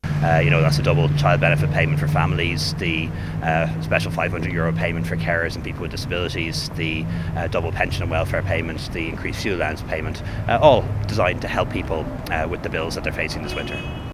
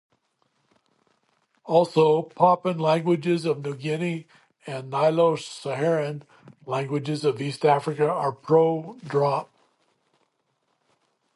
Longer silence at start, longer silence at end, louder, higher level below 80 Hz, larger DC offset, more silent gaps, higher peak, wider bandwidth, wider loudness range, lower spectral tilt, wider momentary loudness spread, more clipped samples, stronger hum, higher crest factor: second, 0.05 s vs 1.65 s; second, 0 s vs 1.9 s; first, -21 LUFS vs -24 LUFS; first, -34 dBFS vs -74 dBFS; neither; neither; first, 0 dBFS vs -4 dBFS; first, 15.5 kHz vs 11.5 kHz; about the same, 5 LU vs 3 LU; about the same, -6 dB/octave vs -7 dB/octave; about the same, 10 LU vs 11 LU; neither; neither; about the same, 22 dB vs 20 dB